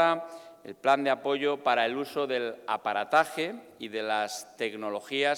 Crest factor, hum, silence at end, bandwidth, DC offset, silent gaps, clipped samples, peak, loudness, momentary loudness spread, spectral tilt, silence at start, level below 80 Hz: 18 dB; none; 0 s; 18.5 kHz; under 0.1%; none; under 0.1%; -10 dBFS; -29 LUFS; 10 LU; -3.5 dB/octave; 0 s; -82 dBFS